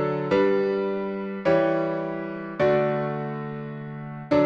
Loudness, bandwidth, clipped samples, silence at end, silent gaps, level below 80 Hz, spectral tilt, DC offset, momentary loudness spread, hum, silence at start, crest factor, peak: -25 LUFS; 7 kHz; under 0.1%; 0 s; none; -60 dBFS; -8.5 dB/octave; under 0.1%; 13 LU; none; 0 s; 16 dB; -10 dBFS